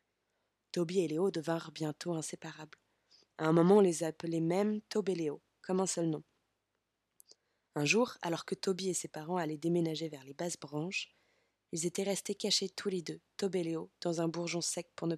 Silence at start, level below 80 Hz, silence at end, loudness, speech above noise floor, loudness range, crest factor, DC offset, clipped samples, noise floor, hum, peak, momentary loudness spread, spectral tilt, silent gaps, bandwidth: 0.75 s; -84 dBFS; 0 s; -34 LUFS; 50 dB; 6 LU; 22 dB; under 0.1%; under 0.1%; -84 dBFS; none; -14 dBFS; 11 LU; -4.5 dB/octave; none; 14.5 kHz